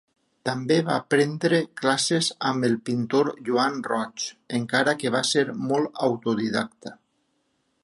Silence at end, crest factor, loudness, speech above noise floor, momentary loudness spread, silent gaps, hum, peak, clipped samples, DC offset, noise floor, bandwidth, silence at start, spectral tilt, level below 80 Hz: 0.9 s; 20 dB; -24 LUFS; 47 dB; 8 LU; none; none; -6 dBFS; under 0.1%; under 0.1%; -71 dBFS; 11.5 kHz; 0.45 s; -4.5 dB/octave; -70 dBFS